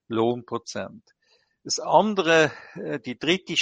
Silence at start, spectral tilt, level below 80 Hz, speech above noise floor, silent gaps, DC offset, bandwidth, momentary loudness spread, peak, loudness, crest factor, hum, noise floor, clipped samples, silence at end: 0.1 s; -3.5 dB/octave; -68 dBFS; 38 dB; none; under 0.1%; 9.4 kHz; 16 LU; -4 dBFS; -24 LUFS; 22 dB; none; -62 dBFS; under 0.1%; 0 s